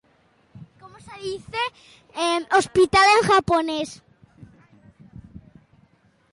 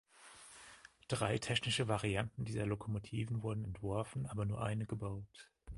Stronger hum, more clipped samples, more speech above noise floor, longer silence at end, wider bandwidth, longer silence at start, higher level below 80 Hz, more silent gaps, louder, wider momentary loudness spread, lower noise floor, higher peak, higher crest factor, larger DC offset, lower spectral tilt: neither; neither; first, 40 dB vs 21 dB; first, 0.95 s vs 0 s; about the same, 11.5 kHz vs 11.5 kHz; first, 0.55 s vs 0.2 s; first, -50 dBFS vs -58 dBFS; neither; first, -20 LUFS vs -39 LUFS; about the same, 19 LU vs 20 LU; about the same, -61 dBFS vs -60 dBFS; first, -8 dBFS vs -20 dBFS; about the same, 16 dB vs 20 dB; neither; second, -3.5 dB/octave vs -5 dB/octave